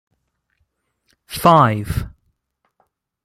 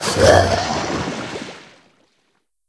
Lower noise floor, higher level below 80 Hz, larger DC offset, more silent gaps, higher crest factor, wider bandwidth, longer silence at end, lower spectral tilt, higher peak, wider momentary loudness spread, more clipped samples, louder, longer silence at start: about the same, -70 dBFS vs -67 dBFS; about the same, -40 dBFS vs -38 dBFS; neither; neither; about the same, 20 dB vs 20 dB; first, 16 kHz vs 11 kHz; about the same, 1.15 s vs 1.05 s; first, -6 dB/octave vs -4 dB/octave; about the same, -2 dBFS vs 0 dBFS; about the same, 19 LU vs 18 LU; neither; about the same, -16 LUFS vs -17 LUFS; first, 1.3 s vs 0 s